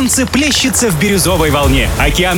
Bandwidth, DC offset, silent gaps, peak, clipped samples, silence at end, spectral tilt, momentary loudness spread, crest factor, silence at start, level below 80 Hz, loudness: 20 kHz; under 0.1%; none; 0 dBFS; under 0.1%; 0 s; -3.5 dB/octave; 1 LU; 12 dB; 0 s; -20 dBFS; -11 LUFS